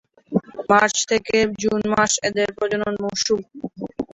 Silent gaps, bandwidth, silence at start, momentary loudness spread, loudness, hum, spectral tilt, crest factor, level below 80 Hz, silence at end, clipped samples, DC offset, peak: none; 8.2 kHz; 0.3 s; 11 LU; -20 LUFS; none; -3 dB/octave; 18 dB; -54 dBFS; 0.1 s; under 0.1%; under 0.1%; -2 dBFS